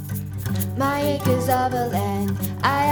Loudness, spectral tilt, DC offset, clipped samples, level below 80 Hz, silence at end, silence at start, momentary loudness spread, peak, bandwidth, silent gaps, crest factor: -23 LUFS; -6 dB/octave; under 0.1%; under 0.1%; -48 dBFS; 0 s; 0 s; 6 LU; -6 dBFS; over 20 kHz; none; 16 dB